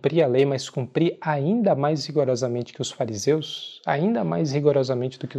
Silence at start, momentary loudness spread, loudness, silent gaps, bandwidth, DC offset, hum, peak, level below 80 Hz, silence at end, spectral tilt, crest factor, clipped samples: 0.05 s; 7 LU; -23 LUFS; none; 12.5 kHz; under 0.1%; none; -6 dBFS; -72 dBFS; 0 s; -6 dB/octave; 16 dB; under 0.1%